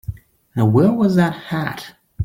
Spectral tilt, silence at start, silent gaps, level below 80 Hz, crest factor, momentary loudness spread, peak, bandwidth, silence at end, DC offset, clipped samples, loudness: -8 dB/octave; 0.1 s; none; -46 dBFS; 14 dB; 19 LU; -4 dBFS; 16 kHz; 0 s; under 0.1%; under 0.1%; -17 LUFS